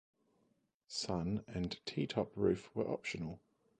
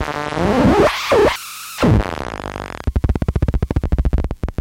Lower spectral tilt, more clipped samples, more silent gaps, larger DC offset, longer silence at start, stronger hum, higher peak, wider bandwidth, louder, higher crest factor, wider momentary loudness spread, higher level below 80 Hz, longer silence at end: about the same, -5.5 dB/octave vs -6.5 dB/octave; neither; neither; neither; first, 0.9 s vs 0 s; neither; second, -20 dBFS vs -2 dBFS; second, 9.6 kHz vs 17 kHz; second, -39 LUFS vs -18 LUFS; first, 22 dB vs 14 dB; second, 9 LU vs 12 LU; second, -62 dBFS vs -24 dBFS; first, 0.45 s vs 0.05 s